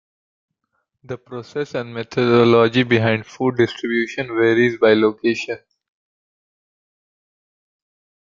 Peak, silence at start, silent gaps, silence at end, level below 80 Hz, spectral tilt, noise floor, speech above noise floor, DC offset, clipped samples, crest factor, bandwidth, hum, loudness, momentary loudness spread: -2 dBFS; 1.1 s; none; 2.65 s; -60 dBFS; -6.5 dB/octave; -73 dBFS; 55 dB; under 0.1%; under 0.1%; 18 dB; 7.4 kHz; none; -18 LUFS; 16 LU